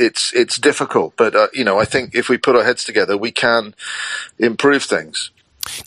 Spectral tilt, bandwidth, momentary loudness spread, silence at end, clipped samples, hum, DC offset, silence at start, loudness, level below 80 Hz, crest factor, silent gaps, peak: -3 dB/octave; 13.5 kHz; 11 LU; 0.05 s; under 0.1%; none; under 0.1%; 0 s; -16 LUFS; -54 dBFS; 16 dB; none; 0 dBFS